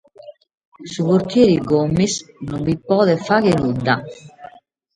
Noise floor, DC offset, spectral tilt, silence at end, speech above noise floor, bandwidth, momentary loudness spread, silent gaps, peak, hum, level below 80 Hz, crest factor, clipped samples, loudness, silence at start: -44 dBFS; under 0.1%; -6 dB/octave; 0.5 s; 27 dB; 11 kHz; 15 LU; 0.67-0.72 s; 0 dBFS; none; -48 dBFS; 18 dB; under 0.1%; -17 LUFS; 0.25 s